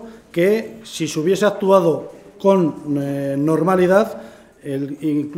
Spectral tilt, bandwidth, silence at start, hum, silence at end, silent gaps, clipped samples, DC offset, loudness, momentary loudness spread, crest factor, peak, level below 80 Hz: -6.5 dB/octave; 16 kHz; 0 s; none; 0 s; none; under 0.1%; under 0.1%; -18 LUFS; 13 LU; 18 dB; 0 dBFS; -58 dBFS